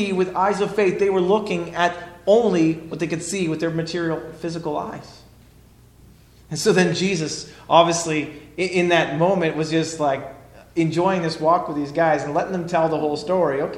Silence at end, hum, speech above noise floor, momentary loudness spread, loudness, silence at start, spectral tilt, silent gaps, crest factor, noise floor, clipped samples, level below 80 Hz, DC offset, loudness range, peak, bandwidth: 0 s; none; 29 dB; 10 LU; -21 LUFS; 0 s; -5 dB/octave; none; 22 dB; -50 dBFS; under 0.1%; -54 dBFS; under 0.1%; 6 LU; 0 dBFS; 13.5 kHz